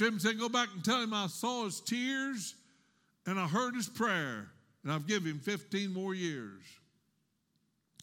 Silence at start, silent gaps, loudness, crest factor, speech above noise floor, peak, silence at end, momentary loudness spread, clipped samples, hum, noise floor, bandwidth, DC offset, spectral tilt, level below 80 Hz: 0 s; none; -35 LUFS; 20 dB; 43 dB; -16 dBFS; 1.3 s; 12 LU; under 0.1%; none; -78 dBFS; 17 kHz; under 0.1%; -4 dB/octave; -84 dBFS